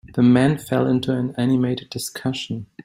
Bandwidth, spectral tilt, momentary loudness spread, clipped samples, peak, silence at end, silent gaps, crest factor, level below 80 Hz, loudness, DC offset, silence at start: 16 kHz; -6.5 dB/octave; 12 LU; under 0.1%; -4 dBFS; 0.2 s; none; 16 dB; -54 dBFS; -21 LUFS; under 0.1%; 0.05 s